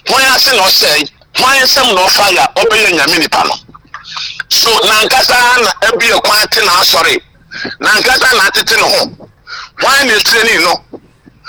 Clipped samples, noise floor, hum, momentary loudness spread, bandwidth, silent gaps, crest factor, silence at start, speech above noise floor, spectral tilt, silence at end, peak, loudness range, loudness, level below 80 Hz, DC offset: under 0.1%; -30 dBFS; none; 13 LU; over 20 kHz; none; 8 dB; 0.05 s; 21 dB; -0.5 dB/octave; 0 s; -2 dBFS; 2 LU; -7 LUFS; -42 dBFS; under 0.1%